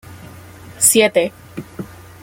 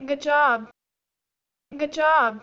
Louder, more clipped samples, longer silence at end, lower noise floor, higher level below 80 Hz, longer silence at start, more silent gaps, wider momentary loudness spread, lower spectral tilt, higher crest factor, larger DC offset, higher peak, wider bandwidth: first, -14 LUFS vs -21 LUFS; neither; first, 0.35 s vs 0.05 s; second, -38 dBFS vs -86 dBFS; first, -54 dBFS vs -68 dBFS; about the same, 0.1 s vs 0 s; neither; first, 23 LU vs 10 LU; second, -2 dB/octave vs -3.5 dB/octave; about the same, 20 dB vs 16 dB; neither; first, 0 dBFS vs -8 dBFS; first, 17 kHz vs 7.6 kHz